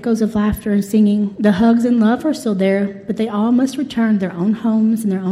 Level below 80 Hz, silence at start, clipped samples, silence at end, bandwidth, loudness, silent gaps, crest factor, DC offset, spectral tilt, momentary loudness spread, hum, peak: -44 dBFS; 0 s; under 0.1%; 0 s; 14.5 kHz; -16 LUFS; none; 12 dB; under 0.1%; -7 dB/octave; 5 LU; none; -4 dBFS